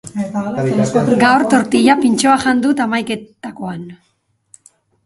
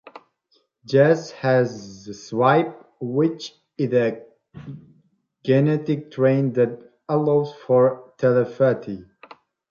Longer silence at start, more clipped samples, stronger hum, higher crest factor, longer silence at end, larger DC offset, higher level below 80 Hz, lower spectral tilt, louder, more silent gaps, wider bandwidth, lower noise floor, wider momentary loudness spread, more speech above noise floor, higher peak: second, 0.05 s vs 0.9 s; neither; neither; about the same, 16 dB vs 18 dB; first, 1.1 s vs 0.7 s; neither; first, -54 dBFS vs -66 dBFS; second, -5 dB/octave vs -7.5 dB/octave; first, -14 LUFS vs -21 LUFS; neither; first, 11.5 kHz vs 7.2 kHz; second, -52 dBFS vs -66 dBFS; second, 15 LU vs 19 LU; second, 37 dB vs 46 dB; first, 0 dBFS vs -4 dBFS